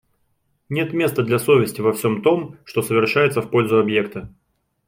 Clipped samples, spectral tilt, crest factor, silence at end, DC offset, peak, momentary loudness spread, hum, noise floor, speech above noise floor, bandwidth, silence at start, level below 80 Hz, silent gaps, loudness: under 0.1%; -6 dB/octave; 16 dB; 0.6 s; under 0.1%; -4 dBFS; 9 LU; none; -67 dBFS; 48 dB; 16.5 kHz; 0.7 s; -58 dBFS; none; -19 LUFS